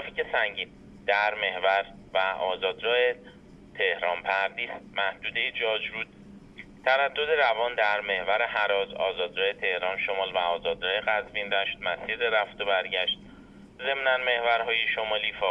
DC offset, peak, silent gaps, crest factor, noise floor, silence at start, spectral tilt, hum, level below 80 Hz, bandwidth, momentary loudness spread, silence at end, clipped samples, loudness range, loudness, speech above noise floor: under 0.1%; -10 dBFS; none; 18 dB; -49 dBFS; 0 s; -4 dB/octave; none; -60 dBFS; 7.8 kHz; 7 LU; 0 s; under 0.1%; 2 LU; -27 LUFS; 22 dB